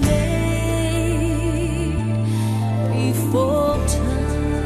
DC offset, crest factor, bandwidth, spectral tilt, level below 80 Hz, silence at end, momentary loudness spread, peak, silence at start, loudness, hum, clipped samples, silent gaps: under 0.1%; 12 dB; 14 kHz; -6.5 dB/octave; -26 dBFS; 0 s; 3 LU; -6 dBFS; 0 s; -20 LUFS; none; under 0.1%; none